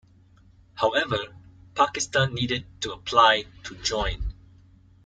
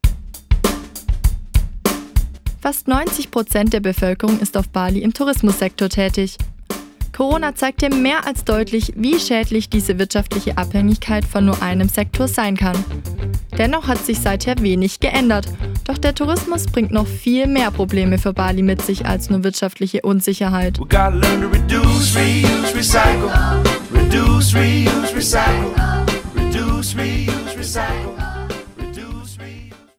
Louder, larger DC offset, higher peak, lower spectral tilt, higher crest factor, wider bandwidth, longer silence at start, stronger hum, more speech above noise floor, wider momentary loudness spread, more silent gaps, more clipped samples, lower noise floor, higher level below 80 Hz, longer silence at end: second, -24 LUFS vs -17 LUFS; neither; second, -4 dBFS vs 0 dBFS; second, -3 dB/octave vs -5 dB/octave; first, 22 dB vs 16 dB; second, 9.6 kHz vs 18 kHz; first, 0.75 s vs 0.05 s; neither; first, 31 dB vs 21 dB; first, 18 LU vs 11 LU; neither; neither; first, -55 dBFS vs -37 dBFS; second, -42 dBFS vs -24 dBFS; first, 0.75 s vs 0.25 s